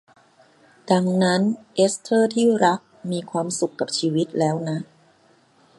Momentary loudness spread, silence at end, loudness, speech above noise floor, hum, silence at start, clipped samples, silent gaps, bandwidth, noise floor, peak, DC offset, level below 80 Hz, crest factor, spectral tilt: 11 LU; 0.95 s; -22 LUFS; 37 dB; none; 0.85 s; under 0.1%; none; 11.5 kHz; -58 dBFS; -2 dBFS; under 0.1%; -70 dBFS; 20 dB; -5 dB/octave